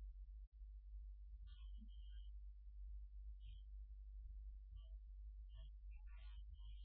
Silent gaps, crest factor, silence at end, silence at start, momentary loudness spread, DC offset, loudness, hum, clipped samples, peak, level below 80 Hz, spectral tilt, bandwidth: 0.47-0.52 s; 8 dB; 0 s; 0 s; 2 LU; under 0.1%; -60 LUFS; none; under 0.1%; -46 dBFS; -56 dBFS; -9 dB/octave; 3.8 kHz